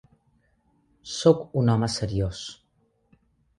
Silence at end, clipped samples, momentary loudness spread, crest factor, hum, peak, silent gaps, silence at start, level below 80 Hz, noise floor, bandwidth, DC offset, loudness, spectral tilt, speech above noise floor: 1.05 s; under 0.1%; 17 LU; 22 dB; none; -6 dBFS; none; 1.05 s; -48 dBFS; -68 dBFS; 11 kHz; under 0.1%; -24 LUFS; -6 dB/octave; 44 dB